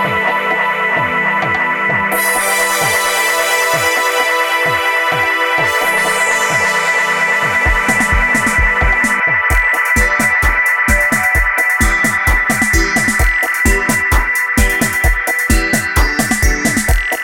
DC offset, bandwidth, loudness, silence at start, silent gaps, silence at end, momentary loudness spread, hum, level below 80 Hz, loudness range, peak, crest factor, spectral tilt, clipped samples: under 0.1%; 19.5 kHz; -12 LUFS; 0 s; none; 0 s; 2 LU; none; -22 dBFS; 2 LU; 0 dBFS; 12 dB; -3 dB/octave; under 0.1%